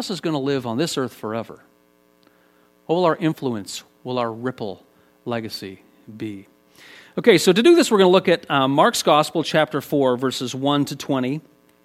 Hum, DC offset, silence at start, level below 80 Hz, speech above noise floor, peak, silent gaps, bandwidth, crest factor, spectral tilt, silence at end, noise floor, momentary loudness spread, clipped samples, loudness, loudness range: none; under 0.1%; 0 s; -66 dBFS; 39 dB; 0 dBFS; none; 15.5 kHz; 20 dB; -5 dB/octave; 0.45 s; -58 dBFS; 18 LU; under 0.1%; -20 LUFS; 12 LU